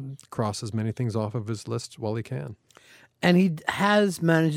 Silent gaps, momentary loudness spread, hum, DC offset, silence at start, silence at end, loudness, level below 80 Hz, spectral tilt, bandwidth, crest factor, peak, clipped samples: none; 13 LU; none; under 0.1%; 0 s; 0 s; -26 LUFS; -64 dBFS; -6 dB/octave; 15.5 kHz; 20 dB; -6 dBFS; under 0.1%